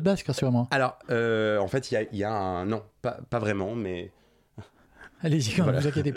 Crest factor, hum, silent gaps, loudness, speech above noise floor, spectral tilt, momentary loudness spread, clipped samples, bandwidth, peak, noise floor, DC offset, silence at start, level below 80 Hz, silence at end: 18 dB; none; none; -27 LUFS; 26 dB; -6 dB/octave; 9 LU; under 0.1%; 14.5 kHz; -10 dBFS; -53 dBFS; under 0.1%; 0 s; -58 dBFS; 0 s